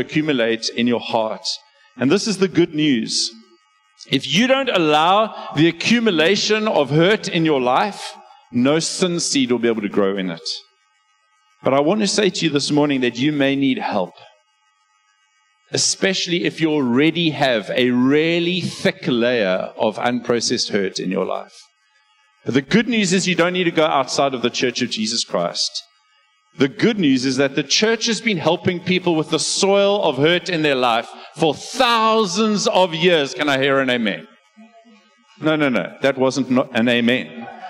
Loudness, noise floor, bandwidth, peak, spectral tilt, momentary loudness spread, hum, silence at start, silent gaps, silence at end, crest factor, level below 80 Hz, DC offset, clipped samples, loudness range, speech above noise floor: -18 LUFS; -62 dBFS; 13 kHz; -4 dBFS; -4 dB/octave; 7 LU; none; 0 s; none; 0 s; 16 dB; -64 dBFS; under 0.1%; under 0.1%; 4 LU; 44 dB